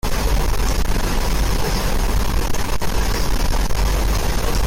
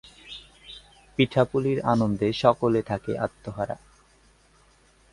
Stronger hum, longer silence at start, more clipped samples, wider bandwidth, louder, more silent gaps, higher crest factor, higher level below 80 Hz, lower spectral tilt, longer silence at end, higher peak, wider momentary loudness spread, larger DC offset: neither; second, 0.05 s vs 0.25 s; neither; first, 17 kHz vs 11.5 kHz; first, -22 LUFS vs -25 LUFS; neither; second, 8 dB vs 24 dB; first, -20 dBFS vs -54 dBFS; second, -4.5 dB/octave vs -7 dB/octave; second, 0 s vs 1.35 s; second, -8 dBFS vs -4 dBFS; second, 2 LU vs 21 LU; neither